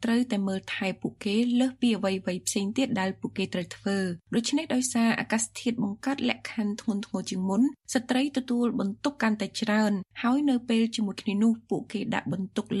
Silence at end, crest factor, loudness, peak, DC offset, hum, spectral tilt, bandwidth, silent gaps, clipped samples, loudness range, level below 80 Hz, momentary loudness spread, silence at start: 0 s; 20 dB; -28 LUFS; -8 dBFS; under 0.1%; none; -4.5 dB/octave; 13.5 kHz; none; under 0.1%; 2 LU; -66 dBFS; 6 LU; 0 s